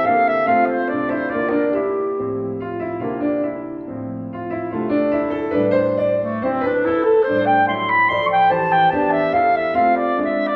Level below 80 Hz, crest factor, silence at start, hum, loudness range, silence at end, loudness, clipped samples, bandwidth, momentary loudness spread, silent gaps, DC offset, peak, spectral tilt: -54 dBFS; 12 dB; 0 s; none; 7 LU; 0 s; -19 LUFS; under 0.1%; 5.6 kHz; 10 LU; none; under 0.1%; -6 dBFS; -8.5 dB/octave